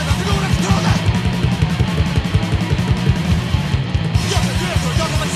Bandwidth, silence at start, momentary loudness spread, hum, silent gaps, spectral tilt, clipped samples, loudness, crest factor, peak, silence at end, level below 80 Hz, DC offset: 14.5 kHz; 0 s; 2 LU; none; none; -5.5 dB/octave; under 0.1%; -17 LUFS; 14 dB; -2 dBFS; 0 s; -26 dBFS; under 0.1%